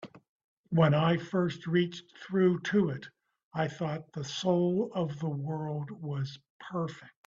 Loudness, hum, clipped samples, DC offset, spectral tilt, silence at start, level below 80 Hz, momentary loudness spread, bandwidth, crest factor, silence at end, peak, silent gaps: -31 LUFS; none; under 0.1%; under 0.1%; -7 dB/octave; 0 s; -68 dBFS; 12 LU; 7.6 kHz; 18 dB; 0.15 s; -12 dBFS; 0.29-0.64 s, 3.44-3.51 s, 6.50-6.60 s